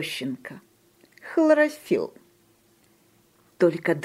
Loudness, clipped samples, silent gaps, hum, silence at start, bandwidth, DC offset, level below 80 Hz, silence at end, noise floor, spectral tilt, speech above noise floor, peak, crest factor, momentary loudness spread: -24 LUFS; under 0.1%; none; none; 0 s; 15.5 kHz; under 0.1%; -76 dBFS; 0 s; -61 dBFS; -5.5 dB/octave; 38 dB; -8 dBFS; 18 dB; 18 LU